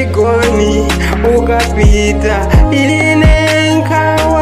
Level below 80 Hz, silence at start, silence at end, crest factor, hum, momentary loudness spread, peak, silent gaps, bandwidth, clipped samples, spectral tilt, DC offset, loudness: -14 dBFS; 0 s; 0 s; 10 dB; none; 4 LU; 0 dBFS; none; 15 kHz; under 0.1%; -5.5 dB/octave; 0.9%; -10 LUFS